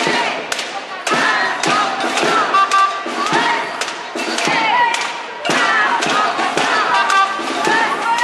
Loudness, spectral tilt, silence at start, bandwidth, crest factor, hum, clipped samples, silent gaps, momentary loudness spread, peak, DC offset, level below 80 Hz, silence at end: -16 LUFS; -2 dB/octave; 0 s; 13 kHz; 14 dB; none; under 0.1%; none; 8 LU; -2 dBFS; under 0.1%; -68 dBFS; 0 s